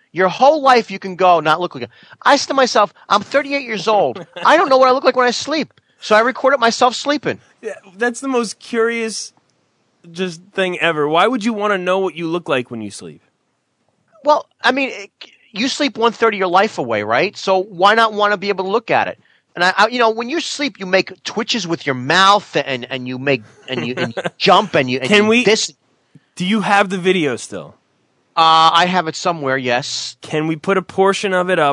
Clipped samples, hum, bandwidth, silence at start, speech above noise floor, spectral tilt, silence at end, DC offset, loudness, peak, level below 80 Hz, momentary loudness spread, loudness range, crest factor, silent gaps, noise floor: under 0.1%; none; 11 kHz; 0.15 s; 51 dB; -4 dB/octave; 0 s; under 0.1%; -16 LUFS; 0 dBFS; -72 dBFS; 13 LU; 6 LU; 16 dB; none; -67 dBFS